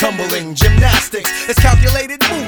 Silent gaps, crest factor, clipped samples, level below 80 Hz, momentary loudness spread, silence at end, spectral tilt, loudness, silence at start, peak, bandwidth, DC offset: none; 12 dB; under 0.1%; -18 dBFS; 7 LU; 0 s; -4 dB/octave; -13 LUFS; 0 s; 0 dBFS; over 20 kHz; under 0.1%